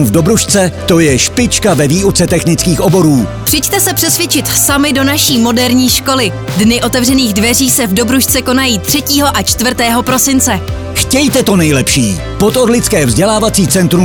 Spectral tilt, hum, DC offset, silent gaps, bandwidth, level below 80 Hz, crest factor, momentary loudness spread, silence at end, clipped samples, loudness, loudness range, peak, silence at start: -3.5 dB/octave; none; under 0.1%; none; over 20 kHz; -28 dBFS; 10 dB; 3 LU; 0 s; under 0.1%; -9 LUFS; 1 LU; 0 dBFS; 0 s